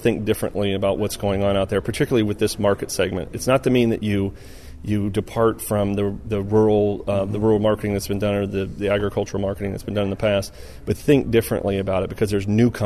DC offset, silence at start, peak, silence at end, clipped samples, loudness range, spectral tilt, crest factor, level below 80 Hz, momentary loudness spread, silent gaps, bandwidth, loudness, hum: 0.4%; 0 s; -4 dBFS; 0 s; under 0.1%; 2 LU; -6 dB/octave; 16 dB; -40 dBFS; 7 LU; none; 13.5 kHz; -21 LUFS; none